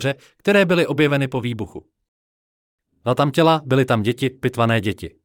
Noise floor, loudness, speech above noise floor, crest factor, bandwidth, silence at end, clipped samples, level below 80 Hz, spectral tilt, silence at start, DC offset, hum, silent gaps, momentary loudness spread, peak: under -90 dBFS; -19 LUFS; over 71 dB; 16 dB; 17 kHz; 0.15 s; under 0.1%; -56 dBFS; -6.5 dB/octave; 0 s; under 0.1%; none; 2.08-2.78 s; 11 LU; -4 dBFS